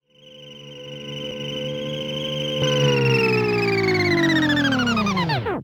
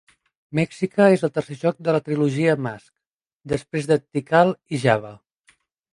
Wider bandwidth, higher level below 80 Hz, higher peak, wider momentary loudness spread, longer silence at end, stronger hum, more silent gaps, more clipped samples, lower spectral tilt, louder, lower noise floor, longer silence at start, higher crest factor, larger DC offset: first, 18.5 kHz vs 11.5 kHz; first, -50 dBFS vs -60 dBFS; second, -6 dBFS vs -2 dBFS; first, 17 LU vs 11 LU; second, 0 s vs 0.75 s; neither; second, none vs 3.06-3.20 s, 3.33-3.40 s; neither; second, -5.5 dB/octave vs -7 dB/octave; about the same, -21 LUFS vs -21 LUFS; second, -45 dBFS vs -80 dBFS; second, 0.25 s vs 0.5 s; second, 14 dB vs 20 dB; neither